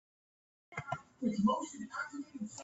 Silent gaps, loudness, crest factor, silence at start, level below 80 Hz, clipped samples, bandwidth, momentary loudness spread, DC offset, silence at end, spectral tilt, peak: none; -38 LUFS; 18 dB; 0.7 s; -72 dBFS; under 0.1%; 8.2 kHz; 13 LU; under 0.1%; 0 s; -5.5 dB/octave; -20 dBFS